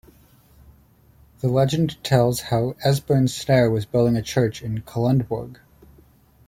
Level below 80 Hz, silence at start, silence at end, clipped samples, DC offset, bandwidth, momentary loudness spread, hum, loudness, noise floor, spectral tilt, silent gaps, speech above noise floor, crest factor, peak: -50 dBFS; 1.45 s; 0.95 s; under 0.1%; under 0.1%; 16.5 kHz; 9 LU; none; -21 LUFS; -54 dBFS; -6.5 dB/octave; none; 34 dB; 18 dB; -4 dBFS